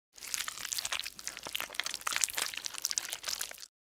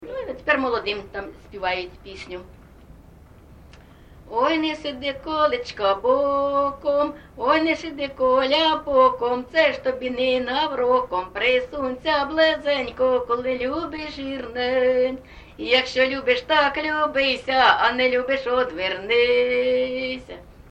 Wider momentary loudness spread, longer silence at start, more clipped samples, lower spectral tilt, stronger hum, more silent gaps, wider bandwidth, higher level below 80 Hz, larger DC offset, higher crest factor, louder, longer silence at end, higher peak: second, 7 LU vs 12 LU; first, 0.15 s vs 0 s; neither; second, 2 dB/octave vs -4.5 dB/octave; neither; neither; first, over 20 kHz vs 8.2 kHz; second, -70 dBFS vs -50 dBFS; neither; first, 36 dB vs 18 dB; second, -35 LUFS vs -21 LUFS; about the same, 0.2 s vs 0.1 s; about the same, -2 dBFS vs -4 dBFS